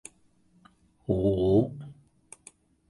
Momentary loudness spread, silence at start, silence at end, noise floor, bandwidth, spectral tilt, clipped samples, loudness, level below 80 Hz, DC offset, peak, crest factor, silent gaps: 26 LU; 1.1 s; 1 s; -64 dBFS; 11.5 kHz; -8.5 dB/octave; under 0.1%; -26 LUFS; -48 dBFS; under 0.1%; -10 dBFS; 20 dB; none